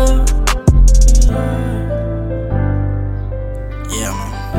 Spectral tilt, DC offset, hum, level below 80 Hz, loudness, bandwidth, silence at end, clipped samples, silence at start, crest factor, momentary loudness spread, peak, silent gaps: -5.5 dB/octave; under 0.1%; none; -14 dBFS; -16 LUFS; 13.5 kHz; 0 s; under 0.1%; 0 s; 12 dB; 12 LU; 0 dBFS; none